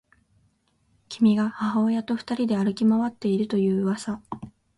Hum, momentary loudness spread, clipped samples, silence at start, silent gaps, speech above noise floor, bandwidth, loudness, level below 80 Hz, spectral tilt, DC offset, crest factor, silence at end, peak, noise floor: none; 12 LU; under 0.1%; 1.1 s; none; 44 dB; 11 kHz; -24 LUFS; -64 dBFS; -7 dB/octave; under 0.1%; 14 dB; 0.3 s; -10 dBFS; -67 dBFS